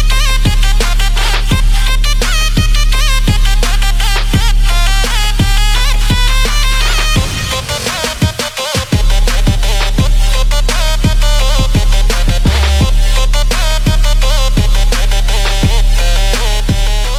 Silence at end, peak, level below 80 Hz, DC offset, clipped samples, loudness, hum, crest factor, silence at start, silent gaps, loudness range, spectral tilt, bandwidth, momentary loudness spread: 0 s; 0 dBFS; -10 dBFS; under 0.1%; under 0.1%; -13 LUFS; none; 10 dB; 0 s; none; 1 LU; -3.5 dB/octave; 15 kHz; 2 LU